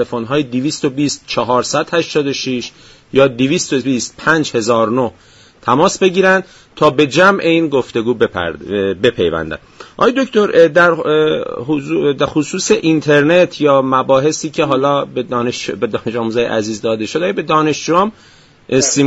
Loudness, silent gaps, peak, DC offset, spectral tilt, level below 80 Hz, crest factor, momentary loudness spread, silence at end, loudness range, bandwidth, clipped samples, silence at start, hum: -14 LUFS; none; 0 dBFS; under 0.1%; -4.5 dB/octave; -48 dBFS; 14 dB; 9 LU; 0 s; 3 LU; 8.2 kHz; under 0.1%; 0 s; none